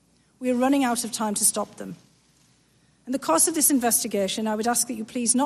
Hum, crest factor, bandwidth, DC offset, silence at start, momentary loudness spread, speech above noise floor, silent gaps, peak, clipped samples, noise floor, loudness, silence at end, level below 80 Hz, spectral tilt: none; 20 dB; 13.5 kHz; under 0.1%; 0.4 s; 13 LU; 38 dB; none; -4 dBFS; under 0.1%; -62 dBFS; -23 LUFS; 0 s; -66 dBFS; -2.5 dB/octave